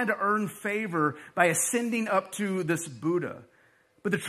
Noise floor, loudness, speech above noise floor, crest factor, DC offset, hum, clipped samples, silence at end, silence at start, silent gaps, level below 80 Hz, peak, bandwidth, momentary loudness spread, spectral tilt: -63 dBFS; -28 LUFS; 35 dB; 22 dB; under 0.1%; none; under 0.1%; 0 s; 0 s; none; -76 dBFS; -6 dBFS; 14.5 kHz; 7 LU; -4.5 dB/octave